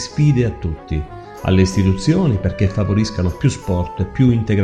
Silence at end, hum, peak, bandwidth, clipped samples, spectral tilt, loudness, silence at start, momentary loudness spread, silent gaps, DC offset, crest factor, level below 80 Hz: 0 s; none; 0 dBFS; 11.5 kHz; under 0.1%; -7 dB/octave; -18 LUFS; 0 s; 10 LU; none; under 0.1%; 16 dB; -32 dBFS